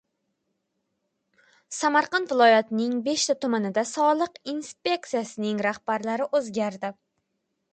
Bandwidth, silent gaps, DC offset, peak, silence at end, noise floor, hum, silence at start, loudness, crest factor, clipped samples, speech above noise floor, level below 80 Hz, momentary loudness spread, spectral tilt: 9.4 kHz; none; under 0.1%; -8 dBFS; 0.8 s; -78 dBFS; none; 1.7 s; -25 LUFS; 18 dB; under 0.1%; 53 dB; -76 dBFS; 11 LU; -3.5 dB/octave